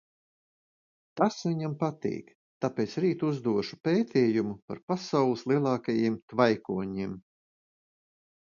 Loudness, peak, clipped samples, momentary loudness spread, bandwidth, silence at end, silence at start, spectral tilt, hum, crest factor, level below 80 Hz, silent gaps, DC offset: -29 LUFS; -8 dBFS; under 0.1%; 10 LU; 7.4 kHz; 1.25 s; 1.15 s; -7 dB/octave; none; 22 dB; -68 dBFS; 2.35-2.61 s, 3.80-3.84 s, 4.62-4.68 s, 4.83-4.88 s, 6.22-6.28 s; under 0.1%